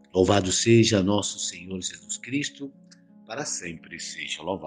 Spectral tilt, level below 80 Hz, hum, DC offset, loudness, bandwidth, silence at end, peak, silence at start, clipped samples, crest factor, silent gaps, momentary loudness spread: -4 dB/octave; -58 dBFS; none; under 0.1%; -25 LUFS; 11 kHz; 0 s; -6 dBFS; 0.15 s; under 0.1%; 20 dB; none; 17 LU